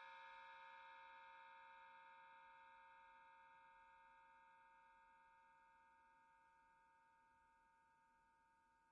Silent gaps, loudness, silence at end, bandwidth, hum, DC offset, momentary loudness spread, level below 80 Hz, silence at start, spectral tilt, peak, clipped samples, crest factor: none; -64 LUFS; 0 s; 6 kHz; none; under 0.1%; 8 LU; under -90 dBFS; 0 s; 1.5 dB/octave; -50 dBFS; under 0.1%; 18 dB